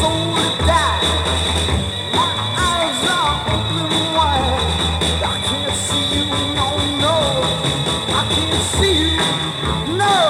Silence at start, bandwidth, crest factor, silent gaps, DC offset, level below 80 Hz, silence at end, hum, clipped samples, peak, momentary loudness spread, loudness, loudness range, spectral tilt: 0 s; 16 kHz; 14 dB; none; under 0.1%; -30 dBFS; 0 s; none; under 0.1%; -4 dBFS; 4 LU; -17 LUFS; 1 LU; -3.5 dB/octave